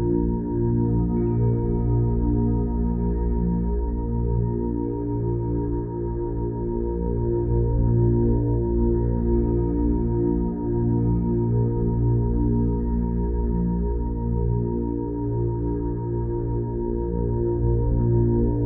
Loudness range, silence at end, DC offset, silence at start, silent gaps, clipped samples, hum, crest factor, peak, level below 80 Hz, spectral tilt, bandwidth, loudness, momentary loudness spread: 3 LU; 0 s; under 0.1%; 0 s; none; under 0.1%; none; 14 dB; -8 dBFS; -28 dBFS; -16 dB/octave; 2 kHz; -24 LUFS; 5 LU